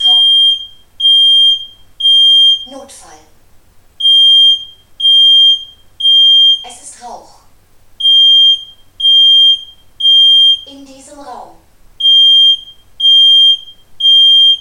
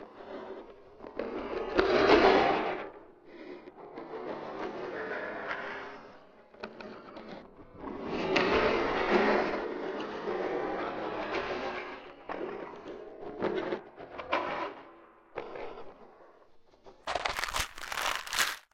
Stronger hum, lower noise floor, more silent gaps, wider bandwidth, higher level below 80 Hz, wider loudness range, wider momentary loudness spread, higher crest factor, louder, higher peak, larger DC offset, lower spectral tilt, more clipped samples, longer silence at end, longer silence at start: neither; second, -43 dBFS vs -58 dBFS; neither; second, 11 kHz vs 16 kHz; first, -50 dBFS vs -56 dBFS; second, 2 LU vs 11 LU; second, 11 LU vs 21 LU; second, 8 dB vs 26 dB; first, -5 LUFS vs -31 LUFS; first, -2 dBFS vs -8 dBFS; neither; second, 1 dB/octave vs -3.5 dB/octave; neither; second, 0 s vs 0.15 s; about the same, 0 s vs 0 s